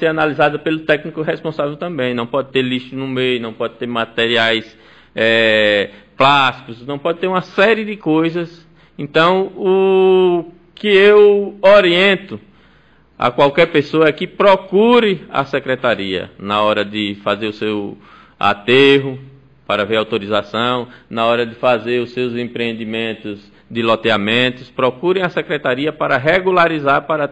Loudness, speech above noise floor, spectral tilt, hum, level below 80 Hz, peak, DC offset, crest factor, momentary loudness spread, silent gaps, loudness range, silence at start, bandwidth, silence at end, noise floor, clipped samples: -15 LUFS; 36 dB; -6 dB/octave; none; -54 dBFS; 0 dBFS; 0.2%; 14 dB; 11 LU; none; 6 LU; 0 s; 8.8 kHz; 0 s; -51 dBFS; under 0.1%